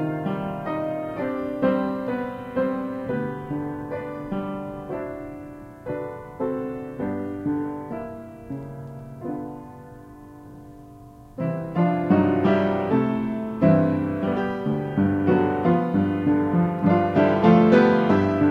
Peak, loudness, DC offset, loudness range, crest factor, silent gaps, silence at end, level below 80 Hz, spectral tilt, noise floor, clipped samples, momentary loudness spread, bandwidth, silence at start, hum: -4 dBFS; -23 LUFS; under 0.1%; 13 LU; 20 dB; none; 0 s; -52 dBFS; -9.5 dB/octave; -45 dBFS; under 0.1%; 18 LU; 6.6 kHz; 0 s; none